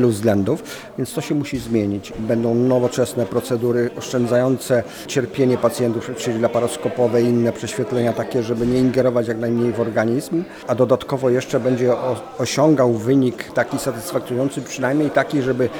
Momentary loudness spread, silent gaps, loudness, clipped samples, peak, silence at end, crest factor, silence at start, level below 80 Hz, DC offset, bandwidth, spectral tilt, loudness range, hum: 7 LU; none; -20 LUFS; under 0.1%; -2 dBFS; 0 s; 16 dB; 0 s; -52 dBFS; under 0.1%; 20 kHz; -6 dB/octave; 2 LU; none